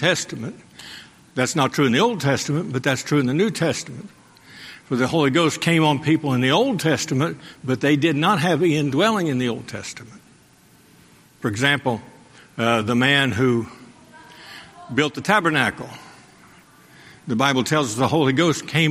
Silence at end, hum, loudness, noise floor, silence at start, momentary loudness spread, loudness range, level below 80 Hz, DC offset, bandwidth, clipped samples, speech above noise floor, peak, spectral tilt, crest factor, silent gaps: 0 s; none; -20 LUFS; -53 dBFS; 0 s; 20 LU; 5 LU; -60 dBFS; under 0.1%; 15.5 kHz; under 0.1%; 33 dB; -2 dBFS; -5 dB/octave; 20 dB; none